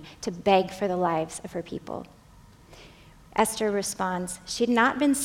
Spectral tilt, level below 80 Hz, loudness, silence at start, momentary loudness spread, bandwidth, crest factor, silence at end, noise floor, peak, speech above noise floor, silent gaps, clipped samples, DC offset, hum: -4 dB/octave; -56 dBFS; -26 LUFS; 0 s; 14 LU; 17 kHz; 20 dB; 0 s; -53 dBFS; -6 dBFS; 27 dB; none; under 0.1%; under 0.1%; none